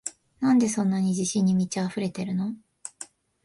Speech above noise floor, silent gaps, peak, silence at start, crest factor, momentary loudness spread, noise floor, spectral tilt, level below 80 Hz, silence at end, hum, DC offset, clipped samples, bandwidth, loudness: 23 dB; none; -12 dBFS; 0.05 s; 14 dB; 18 LU; -47 dBFS; -5.5 dB/octave; -66 dBFS; 0.4 s; none; under 0.1%; under 0.1%; 11.5 kHz; -25 LUFS